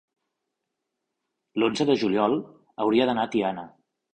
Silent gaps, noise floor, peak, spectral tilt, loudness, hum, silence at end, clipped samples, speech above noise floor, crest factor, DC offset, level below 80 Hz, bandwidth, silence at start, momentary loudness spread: none; -82 dBFS; -8 dBFS; -5.5 dB/octave; -25 LUFS; none; 0.45 s; under 0.1%; 59 dB; 18 dB; under 0.1%; -66 dBFS; 9.2 kHz; 1.55 s; 11 LU